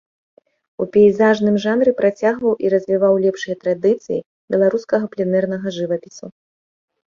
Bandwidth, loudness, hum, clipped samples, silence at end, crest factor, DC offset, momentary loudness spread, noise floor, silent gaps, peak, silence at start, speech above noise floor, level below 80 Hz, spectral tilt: 7.4 kHz; -18 LUFS; none; under 0.1%; 0.8 s; 16 dB; under 0.1%; 11 LU; under -90 dBFS; 4.26-4.48 s; -2 dBFS; 0.8 s; over 73 dB; -60 dBFS; -7 dB/octave